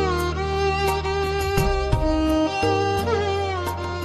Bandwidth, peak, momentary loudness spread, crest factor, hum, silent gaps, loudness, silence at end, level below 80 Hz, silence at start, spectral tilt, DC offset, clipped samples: 15.5 kHz; -6 dBFS; 3 LU; 16 dB; none; none; -22 LUFS; 0 s; -30 dBFS; 0 s; -5.5 dB/octave; under 0.1%; under 0.1%